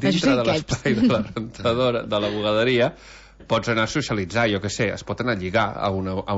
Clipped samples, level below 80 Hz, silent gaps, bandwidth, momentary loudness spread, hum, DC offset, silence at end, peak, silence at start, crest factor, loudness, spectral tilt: under 0.1%; -46 dBFS; none; 8 kHz; 6 LU; none; under 0.1%; 0 s; -6 dBFS; 0 s; 16 dB; -22 LUFS; -5.5 dB/octave